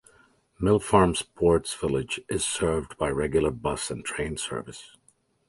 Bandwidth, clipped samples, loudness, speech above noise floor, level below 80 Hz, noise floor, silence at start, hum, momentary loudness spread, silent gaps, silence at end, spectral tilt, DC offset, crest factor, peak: 11.5 kHz; under 0.1%; -26 LUFS; 35 dB; -44 dBFS; -61 dBFS; 0.6 s; none; 10 LU; none; 0.65 s; -4.5 dB/octave; under 0.1%; 22 dB; -4 dBFS